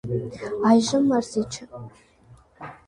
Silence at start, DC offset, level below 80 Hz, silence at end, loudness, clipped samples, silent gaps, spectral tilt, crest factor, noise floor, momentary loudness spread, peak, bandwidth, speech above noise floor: 0.05 s; under 0.1%; -56 dBFS; 0.15 s; -22 LUFS; under 0.1%; none; -5.5 dB/octave; 20 dB; -53 dBFS; 23 LU; -4 dBFS; 11 kHz; 30 dB